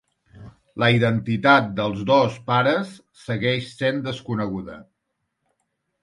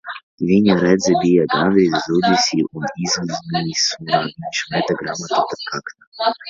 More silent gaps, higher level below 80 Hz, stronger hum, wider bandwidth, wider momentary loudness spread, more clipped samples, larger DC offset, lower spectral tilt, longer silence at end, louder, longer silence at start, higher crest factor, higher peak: second, none vs 0.23-0.38 s, 6.07-6.12 s; about the same, -56 dBFS vs -54 dBFS; neither; first, 11.5 kHz vs 7.6 kHz; first, 15 LU vs 10 LU; neither; neither; first, -6.5 dB/octave vs -4.5 dB/octave; first, 1.2 s vs 0 s; second, -21 LUFS vs -18 LUFS; first, 0.35 s vs 0.05 s; about the same, 22 dB vs 18 dB; about the same, -2 dBFS vs 0 dBFS